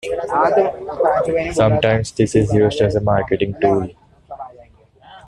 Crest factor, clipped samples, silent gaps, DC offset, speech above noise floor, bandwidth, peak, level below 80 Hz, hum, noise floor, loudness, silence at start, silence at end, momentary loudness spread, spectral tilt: 14 dB; under 0.1%; none; under 0.1%; 31 dB; 11 kHz; -2 dBFS; -42 dBFS; none; -47 dBFS; -17 LUFS; 0.05 s; 0.1 s; 14 LU; -6.5 dB/octave